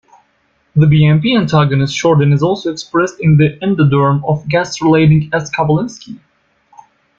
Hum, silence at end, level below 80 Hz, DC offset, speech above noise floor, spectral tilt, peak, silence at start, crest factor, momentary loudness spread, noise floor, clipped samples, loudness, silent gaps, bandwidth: none; 1 s; -44 dBFS; under 0.1%; 47 dB; -7 dB/octave; -2 dBFS; 0.75 s; 12 dB; 7 LU; -59 dBFS; under 0.1%; -12 LUFS; none; 7.6 kHz